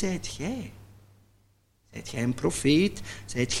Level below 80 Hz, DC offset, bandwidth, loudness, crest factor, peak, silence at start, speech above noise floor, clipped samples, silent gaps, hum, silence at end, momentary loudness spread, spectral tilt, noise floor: -48 dBFS; under 0.1%; 16 kHz; -28 LUFS; 20 dB; -10 dBFS; 0 s; 38 dB; under 0.1%; none; none; 0 s; 18 LU; -4.5 dB/octave; -65 dBFS